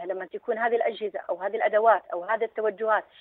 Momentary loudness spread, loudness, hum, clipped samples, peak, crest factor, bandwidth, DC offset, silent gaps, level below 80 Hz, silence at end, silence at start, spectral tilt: 10 LU; -26 LUFS; none; under 0.1%; -8 dBFS; 18 dB; 4.1 kHz; under 0.1%; none; -80 dBFS; 0.2 s; 0 s; -7.5 dB/octave